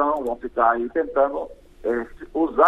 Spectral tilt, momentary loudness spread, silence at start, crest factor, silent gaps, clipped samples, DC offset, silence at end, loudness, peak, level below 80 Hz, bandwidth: -7 dB/octave; 11 LU; 0 s; 18 dB; none; under 0.1%; under 0.1%; 0 s; -24 LUFS; -4 dBFS; -48 dBFS; 12.5 kHz